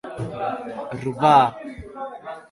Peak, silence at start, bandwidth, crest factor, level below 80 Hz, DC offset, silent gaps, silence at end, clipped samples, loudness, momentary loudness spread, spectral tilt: -2 dBFS; 0.05 s; 11.5 kHz; 20 dB; -52 dBFS; under 0.1%; none; 0.1 s; under 0.1%; -21 LUFS; 21 LU; -6.5 dB/octave